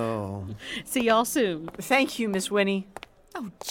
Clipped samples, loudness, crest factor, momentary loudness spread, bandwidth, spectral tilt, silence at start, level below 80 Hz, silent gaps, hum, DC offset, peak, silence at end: under 0.1%; -26 LUFS; 20 dB; 16 LU; 17 kHz; -4 dB/octave; 0 s; -60 dBFS; none; none; under 0.1%; -8 dBFS; 0 s